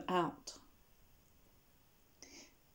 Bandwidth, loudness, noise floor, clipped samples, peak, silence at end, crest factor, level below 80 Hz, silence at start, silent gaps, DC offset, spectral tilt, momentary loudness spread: 20 kHz; -42 LUFS; -70 dBFS; under 0.1%; -22 dBFS; 0.3 s; 24 dB; -72 dBFS; 0 s; none; under 0.1%; -4.5 dB/octave; 21 LU